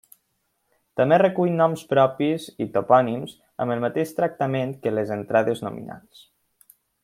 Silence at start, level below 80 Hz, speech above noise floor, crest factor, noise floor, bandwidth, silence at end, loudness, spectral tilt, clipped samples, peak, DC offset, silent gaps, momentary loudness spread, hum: 0.95 s; -66 dBFS; 50 dB; 20 dB; -73 dBFS; 16 kHz; 1.05 s; -22 LUFS; -7 dB/octave; under 0.1%; -4 dBFS; under 0.1%; none; 14 LU; none